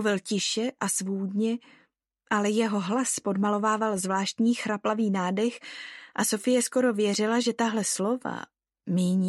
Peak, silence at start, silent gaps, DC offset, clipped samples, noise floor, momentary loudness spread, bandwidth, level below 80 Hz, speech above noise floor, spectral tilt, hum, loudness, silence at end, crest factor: -10 dBFS; 0 s; none; under 0.1%; under 0.1%; -68 dBFS; 10 LU; 12.5 kHz; -78 dBFS; 42 dB; -4 dB/octave; none; -27 LUFS; 0 s; 16 dB